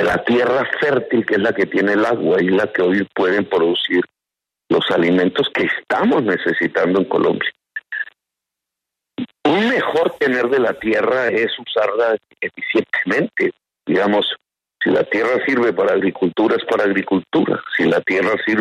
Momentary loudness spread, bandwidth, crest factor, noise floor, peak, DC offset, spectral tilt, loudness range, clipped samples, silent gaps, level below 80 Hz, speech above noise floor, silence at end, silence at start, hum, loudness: 6 LU; 11 kHz; 14 dB; -85 dBFS; -2 dBFS; under 0.1%; -6.5 dB/octave; 3 LU; under 0.1%; none; -60 dBFS; 68 dB; 0 s; 0 s; none; -17 LUFS